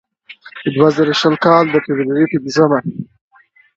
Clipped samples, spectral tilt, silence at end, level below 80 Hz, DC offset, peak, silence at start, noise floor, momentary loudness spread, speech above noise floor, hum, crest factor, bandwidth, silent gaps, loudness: under 0.1%; -6 dB/octave; 0.75 s; -58 dBFS; under 0.1%; 0 dBFS; 0.3 s; -40 dBFS; 16 LU; 27 dB; none; 16 dB; 7.8 kHz; none; -14 LUFS